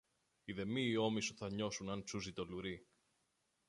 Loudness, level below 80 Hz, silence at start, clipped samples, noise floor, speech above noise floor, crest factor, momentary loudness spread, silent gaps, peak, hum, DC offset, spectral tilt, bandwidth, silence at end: -42 LUFS; -68 dBFS; 0.45 s; under 0.1%; -83 dBFS; 41 dB; 20 dB; 12 LU; none; -24 dBFS; none; under 0.1%; -4.5 dB/octave; 11.5 kHz; 0.85 s